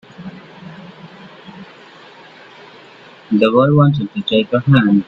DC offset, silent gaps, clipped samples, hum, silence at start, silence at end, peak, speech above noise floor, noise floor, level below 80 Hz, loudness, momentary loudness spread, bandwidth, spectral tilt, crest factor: under 0.1%; none; under 0.1%; none; 0.2 s; 0.05 s; 0 dBFS; 29 dB; -41 dBFS; -52 dBFS; -14 LUFS; 26 LU; 5.2 kHz; -9 dB/octave; 16 dB